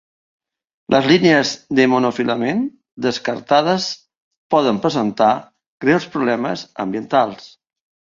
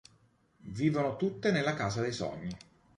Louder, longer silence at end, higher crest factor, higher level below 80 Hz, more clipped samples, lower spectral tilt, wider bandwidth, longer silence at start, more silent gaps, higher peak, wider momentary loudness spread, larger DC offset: first, -18 LUFS vs -32 LUFS; first, 0.65 s vs 0.4 s; about the same, 18 dB vs 18 dB; about the same, -60 dBFS vs -62 dBFS; neither; about the same, -5 dB/octave vs -6 dB/octave; second, 7.6 kHz vs 11.5 kHz; first, 0.9 s vs 0.65 s; first, 2.92-2.97 s, 4.17-4.31 s, 4.37-4.50 s, 5.67-5.78 s vs none; first, 0 dBFS vs -16 dBFS; second, 10 LU vs 15 LU; neither